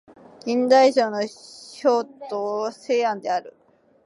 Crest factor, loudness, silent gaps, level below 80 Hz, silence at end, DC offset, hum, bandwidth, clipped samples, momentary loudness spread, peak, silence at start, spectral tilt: 18 dB; -22 LUFS; none; -78 dBFS; 0.55 s; under 0.1%; none; 11.5 kHz; under 0.1%; 15 LU; -4 dBFS; 0.45 s; -4 dB/octave